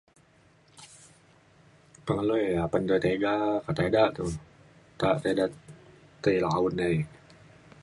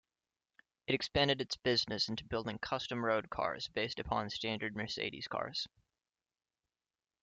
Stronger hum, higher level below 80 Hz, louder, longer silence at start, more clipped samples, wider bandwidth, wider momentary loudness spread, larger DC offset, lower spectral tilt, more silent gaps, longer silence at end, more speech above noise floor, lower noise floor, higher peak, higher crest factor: neither; first, -54 dBFS vs -62 dBFS; first, -27 LUFS vs -36 LUFS; about the same, 0.8 s vs 0.9 s; neither; first, 11.5 kHz vs 9.2 kHz; first, 11 LU vs 8 LU; neither; first, -6.5 dB/octave vs -4.5 dB/octave; neither; second, 0.75 s vs 1.55 s; second, 34 dB vs over 53 dB; second, -61 dBFS vs under -90 dBFS; first, -8 dBFS vs -18 dBFS; about the same, 20 dB vs 20 dB